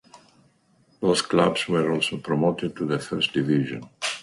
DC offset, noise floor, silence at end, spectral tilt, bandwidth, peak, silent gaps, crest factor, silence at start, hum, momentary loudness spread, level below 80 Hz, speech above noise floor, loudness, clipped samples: under 0.1%; -62 dBFS; 0 s; -5 dB/octave; 11.5 kHz; -4 dBFS; none; 20 dB; 0.15 s; none; 7 LU; -60 dBFS; 38 dB; -24 LUFS; under 0.1%